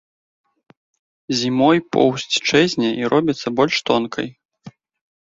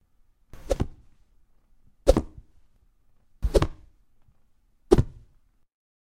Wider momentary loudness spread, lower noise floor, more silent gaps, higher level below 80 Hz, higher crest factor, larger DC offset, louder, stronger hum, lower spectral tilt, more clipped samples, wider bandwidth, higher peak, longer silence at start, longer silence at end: second, 8 LU vs 12 LU; second, -43 dBFS vs -61 dBFS; first, 4.45-4.49 s vs none; second, -60 dBFS vs -34 dBFS; second, 18 dB vs 28 dB; neither; first, -18 LUFS vs -26 LUFS; neither; second, -4.5 dB/octave vs -7 dB/octave; neither; second, 7.8 kHz vs 15 kHz; about the same, -2 dBFS vs -2 dBFS; first, 1.3 s vs 0.65 s; second, 0.7 s vs 0.9 s